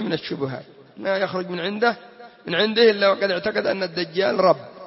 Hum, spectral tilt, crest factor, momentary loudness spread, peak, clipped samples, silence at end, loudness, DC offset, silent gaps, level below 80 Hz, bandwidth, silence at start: none; -8 dB/octave; 18 dB; 13 LU; -4 dBFS; under 0.1%; 0 s; -21 LUFS; under 0.1%; none; -68 dBFS; 6 kHz; 0 s